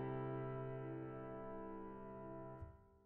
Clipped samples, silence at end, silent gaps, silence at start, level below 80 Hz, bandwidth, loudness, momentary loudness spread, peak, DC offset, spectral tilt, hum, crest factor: under 0.1%; 0 s; none; 0 s; -64 dBFS; 3.8 kHz; -50 LUFS; 8 LU; -34 dBFS; under 0.1%; -8.5 dB/octave; none; 14 dB